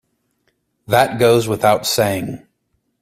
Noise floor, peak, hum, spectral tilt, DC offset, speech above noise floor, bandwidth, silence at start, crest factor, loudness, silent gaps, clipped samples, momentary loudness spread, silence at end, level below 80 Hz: -68 dBFS; 0 dBFS; none; -4.5 dB/octave; under 0.1%; 53 dB; 16 kHz; 0.9 s; 18 dB; -16 LUFS; none; under 0.1%; 12 LU; 0.65 s; -52 dBFS